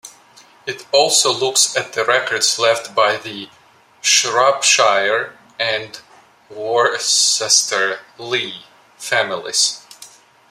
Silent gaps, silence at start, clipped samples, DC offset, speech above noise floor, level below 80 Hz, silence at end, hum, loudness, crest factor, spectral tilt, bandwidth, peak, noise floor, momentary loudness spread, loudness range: none; 0.05 s; under 0.1%; under 0.1%; 30 dB; -70 dBFS; 0.45 s; none; -15 LUFS; 18 dB; 0 dB/octave; 16 kHz; 0 dBFS; -48 dBFS; 17 LU; 2 LU